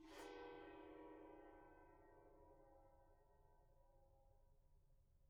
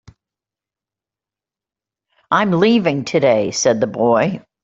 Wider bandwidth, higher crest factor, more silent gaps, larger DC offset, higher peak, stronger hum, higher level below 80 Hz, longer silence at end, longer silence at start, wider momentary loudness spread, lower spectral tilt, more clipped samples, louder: about the same, 8 kHz vs 7.8 kHz; about the same, 20 dB vs 16 dB; neither; neither; second, -44 dBFS vs -2 dBFS; neither; second, -74 dBFS vs -58 dBFS; second, 0 s vs 0.25 s; second, 0 s vs 2.3 s; first, 11 LU vs 4 LU; second, -3.5 dB/octave vs -5 dB/octave; neither; second, -61 LUFS vs -16 LUFS